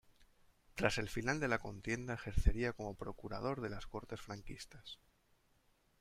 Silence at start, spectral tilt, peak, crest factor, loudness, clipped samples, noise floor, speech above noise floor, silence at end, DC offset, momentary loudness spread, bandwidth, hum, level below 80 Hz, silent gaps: 0.2 s; -5.5 dB/octave; -16 dBFS; 26 dB; -41 LUFS; under 0.1%; -74 dBFS; 35 dB; 1.05 s; under 0.1%; 15 LU; 15 kHz; none; -46 dBFS; none